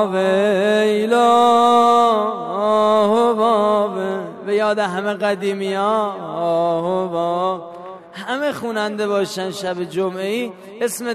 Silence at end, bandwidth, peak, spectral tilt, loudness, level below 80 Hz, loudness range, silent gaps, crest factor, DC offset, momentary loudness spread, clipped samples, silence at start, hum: 0 s; 13.5 kHz; -2 dBFS; -5 dB/octave; -18 LUFS; -66 dBFS; 8 LU; none; 16 dB; under 0.1%; 12 LU; under 0.1%; 0 s; none